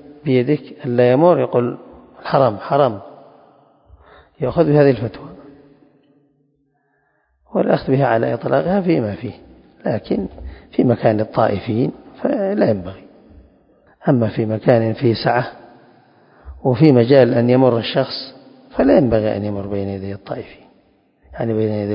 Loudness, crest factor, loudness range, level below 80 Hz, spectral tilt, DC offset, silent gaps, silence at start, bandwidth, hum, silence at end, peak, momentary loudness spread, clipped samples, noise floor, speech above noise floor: -17 LUFS; 18 dB; 5 LU; -46 dBFS; -11 dB/octave; under 0.1%; none; 0.1 s; 5.4 kHz; none; 0 s; 0 dBFS; 15 LU; under 0.1%; -64 dBFS; 48 dB